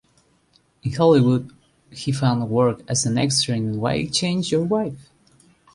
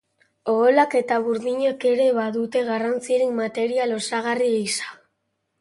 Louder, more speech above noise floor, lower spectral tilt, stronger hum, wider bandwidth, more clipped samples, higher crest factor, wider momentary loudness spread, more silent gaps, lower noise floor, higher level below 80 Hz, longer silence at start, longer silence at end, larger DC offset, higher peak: about the same, -21 LUFS vs -22 LUFS; second, 41 dB vs 54 dB; first, -5 dB/octave vs -3.5 dB/octave; neither; about the same, 11.5 kHz vs 11.5 kHz; neither; about the same, 16 dB vs 18 dB; first, 13 LU vs 7 LU; neither; second, -61 dBFS vs -75 dBFS; first, -54 dBFS vs -72 dBFS; first, 0.85 s vs 0.45 s; about the same, 0.75 s vs 0.65 s; neither; about the same, -4 dBFS vs -4 dBFS